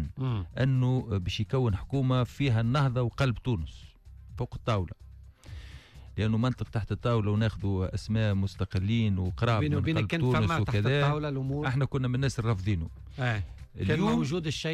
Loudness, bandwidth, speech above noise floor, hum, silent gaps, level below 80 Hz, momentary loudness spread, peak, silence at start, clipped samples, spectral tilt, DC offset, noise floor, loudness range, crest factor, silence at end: -29 LUFS; 10.5 kHz; 20 dB; none; none; -46 dBFS; 12 LU; -16 dBFS; 0 s; under 0.1%; -7 dB/octave; under 0.1%; -47 dBFS; 6 LU; 12 dB; 0 s